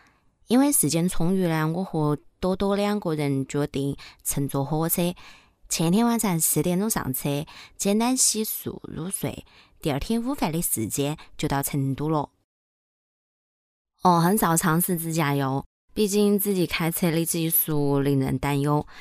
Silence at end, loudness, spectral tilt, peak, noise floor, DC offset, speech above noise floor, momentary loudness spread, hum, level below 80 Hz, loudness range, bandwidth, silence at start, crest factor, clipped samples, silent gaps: 0 s; -24 LUFS; -5 dB/octave; -8 dBFS; -59 dBFS; under 0.1%; 36 dB; 10 LU; none; -46 dBFS; 4 LU; 16 kHz; 0.5 s; 18 dB; under 0.1%; 12.44-13.85 s, 15.66-15.88 s